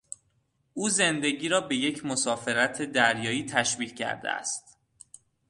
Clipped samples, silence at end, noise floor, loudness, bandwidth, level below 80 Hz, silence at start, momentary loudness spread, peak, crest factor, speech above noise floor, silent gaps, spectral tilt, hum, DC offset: under 0.1%; 0.9 s; -71 dBFS; -27 LUFS; 11.5 kHz; -68 dBFS; 0.75 s; 9 LU; -6 dBFS; 22 dB; 44 dB; none; -2.5 dB/octave; none; under 0.1%